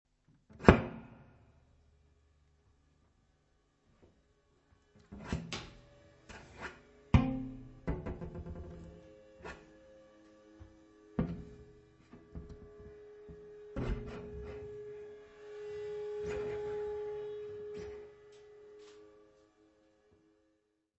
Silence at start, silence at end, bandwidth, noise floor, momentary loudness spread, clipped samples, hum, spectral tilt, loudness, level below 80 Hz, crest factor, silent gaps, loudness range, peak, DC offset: 0.5 s; 1.8 s; 8 kHz; -78 dBFS; 27 LU; under 0.1%; none; -6.5 dB/octave; -37 LUFS; -48 dBFS; 38 dB; none; 11 LU; -2 dBFS; under 0.1%